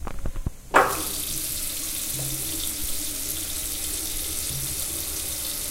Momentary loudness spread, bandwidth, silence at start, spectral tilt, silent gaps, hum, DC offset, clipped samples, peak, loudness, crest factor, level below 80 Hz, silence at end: 6 LU; 16 kHz; 0 s; -1.5 dB/octave; none; none; 0.3%; under 0.1%; -2 dBFS; -26 LUFS; 26 dB; -38 dBFS; 0 s